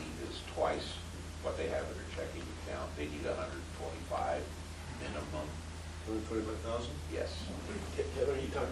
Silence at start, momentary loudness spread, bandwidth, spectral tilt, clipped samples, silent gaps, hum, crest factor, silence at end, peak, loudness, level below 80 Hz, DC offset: 0 s; 9 LU; 12.5 kHz; -5 dB/octave; under 0.1%; none; none; 18 dB; 0 s; -20 dBFS; -39 LUFS; -48 dBFS; under 0.1%